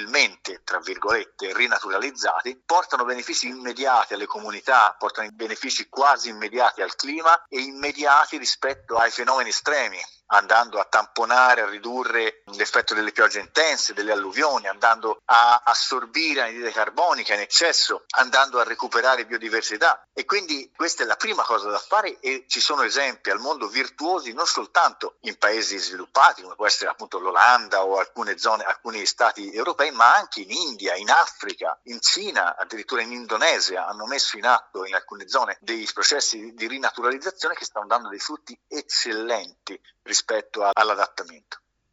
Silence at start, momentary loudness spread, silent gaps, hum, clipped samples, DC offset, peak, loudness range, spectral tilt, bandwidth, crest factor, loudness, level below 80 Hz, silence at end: 0 s; 11 LU; none; none; under 0.1%; under 0.1%; 0 dBFS; 4 LU; 0.5 dB/octave; 8 kHz; 22 dB; -21 LUFS; -70 dBFS; 0.35 s